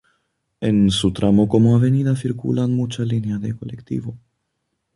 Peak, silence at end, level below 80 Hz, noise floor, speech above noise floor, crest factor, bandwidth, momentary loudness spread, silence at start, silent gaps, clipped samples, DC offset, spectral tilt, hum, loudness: -4 dBFS; 0.8 s; -44 dBFS; -74 dBFS; 56 dB; 16 dB; 11.5 kHz; 13 LU; 0.6 s; none; under 0.1%; under 0.1%; -7.5 dB/octave; none; -19 LUFS